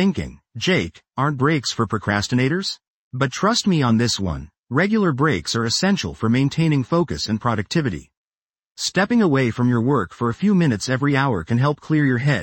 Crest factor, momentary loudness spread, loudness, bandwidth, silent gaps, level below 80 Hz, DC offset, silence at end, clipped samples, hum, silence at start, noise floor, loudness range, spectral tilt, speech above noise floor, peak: 16 dB; 7 LU; -20 LUFS; 16.5 kHz; 2.87-3.11 s, 4.58-4.63 s, 8.17-8.25 s; -46 dBFS; under 0.1%; 0 s; under 0.1%; none; 0 s; under -90 dBFS; 2 LU; -5.5 dB/octave; over 71 dB; -4 dBFS